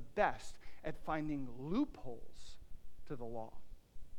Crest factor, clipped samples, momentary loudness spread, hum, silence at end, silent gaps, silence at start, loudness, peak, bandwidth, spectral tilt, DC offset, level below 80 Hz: 22 dB; under 0.1%; 22 LU; none; 0 s; none; 0 s; -42 LUFS; -18 dBFS; 11.5 kHz; -6.5 dB/octave; under 0.1%; -54 dBFS